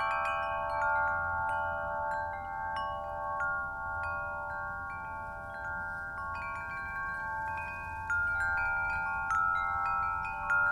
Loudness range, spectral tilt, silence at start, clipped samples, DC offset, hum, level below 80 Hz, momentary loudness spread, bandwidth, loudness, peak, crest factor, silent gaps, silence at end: 6 LU; -5 dB/octave; 0 s; under 0.1%; under 0.1%; none; -52 dBFS; 8 LU; 13.5 kHz; -33 LUFS; -20 dBFS; 14 dB; none; 0 s